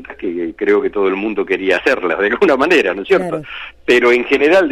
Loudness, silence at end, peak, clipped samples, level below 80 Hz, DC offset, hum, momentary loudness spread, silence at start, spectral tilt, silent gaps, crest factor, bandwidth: -14 LUFS; 0 s; -2 dBFS; under 0.1%; -48 dBFS; under 0.1%; none; 11 LU; 0 s; -5 dB/octave; none; 12 dB; 12 kHz